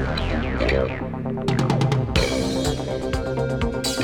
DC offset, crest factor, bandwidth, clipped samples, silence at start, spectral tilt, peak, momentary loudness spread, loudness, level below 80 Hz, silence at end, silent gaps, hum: under 0.1%; 20 dB; 19 kHz; under 0.1%; 0 s; -5.5 dB/octave; -2 dBFS; 6 LU; -23 LUFS; -32 dBFS; 0 s; none; none